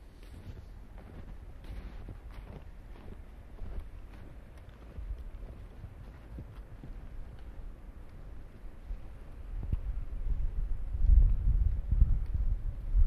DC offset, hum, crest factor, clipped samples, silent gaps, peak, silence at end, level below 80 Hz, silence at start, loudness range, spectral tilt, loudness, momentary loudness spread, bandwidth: under 0.1%; none; 22 dB; under 0.1%; none; -12 dBFS; 0 s; -34 dBFS; 0 s; 17 LU; -9 dB/octave; -36 LUFS; 21 LU; 3.6 kHz